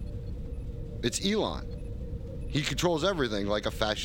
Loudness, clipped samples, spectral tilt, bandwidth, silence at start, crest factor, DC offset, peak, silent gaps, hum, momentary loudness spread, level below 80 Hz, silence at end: -31 LUFS; under 0.1%; -4.5 dB/octave; 17.5 kHz; 0 s; 22 dB; under 0.1%; -10 dBFS; none; none; 12 LU; -40 dBFS; 0 s